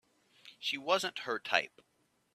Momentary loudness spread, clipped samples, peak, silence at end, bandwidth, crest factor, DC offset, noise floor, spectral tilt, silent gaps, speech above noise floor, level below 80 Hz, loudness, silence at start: 7 LU; under 0.1%; -10 dBFS; 0.65 s; 15 kHz; 26 dB; under 0.1%; -61 dBFS; -1.5 dB/octave; none; 26 dB; -86 dBFS; -34 LUFS; 0.45 s